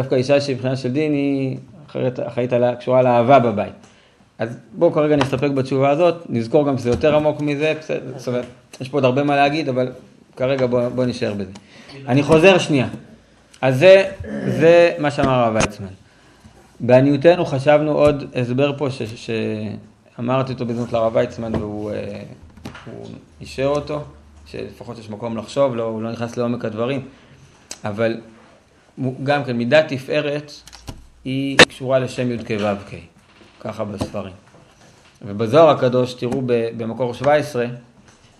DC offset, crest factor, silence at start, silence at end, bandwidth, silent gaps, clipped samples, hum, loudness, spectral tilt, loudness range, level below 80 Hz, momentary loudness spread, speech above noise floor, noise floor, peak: under 0.1%; 18 dB; 0 s; 0.6 s; 12.5 kHz; none; under 0.1%; none; -18 LUFS; -6 dB/octave; 9 LU; -50 dBFS; 20 LU; 34 dB; -52 dBFS; 0 dBFS